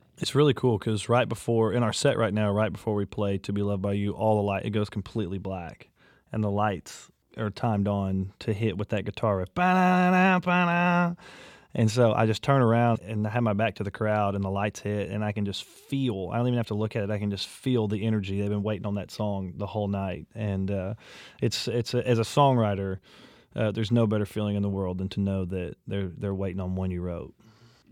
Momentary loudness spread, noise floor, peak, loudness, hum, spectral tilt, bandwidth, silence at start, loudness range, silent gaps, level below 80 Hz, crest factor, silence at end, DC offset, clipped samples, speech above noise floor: 11 LU; -56 dBFS; -8 dBFS; -27 LUFS; none; -6.5 dB/octave; 14.5 kHz; 0.2 s; 6 LU; none; -58 dBFS; 20 dB; 0.6 s; under 0.1%; under 0.1%; 30 dB